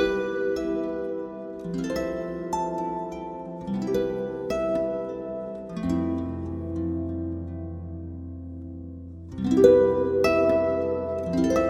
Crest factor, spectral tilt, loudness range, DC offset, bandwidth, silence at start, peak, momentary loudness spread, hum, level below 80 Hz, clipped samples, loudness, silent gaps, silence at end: 22 dB; -7 dB/octave; 8 LU; under 0.1%; 15.5 kHz; 0 s; -4 dBFS; 16 LU; none; -48 dBFS; under 0.1%; -26 LUFS; none; 0 s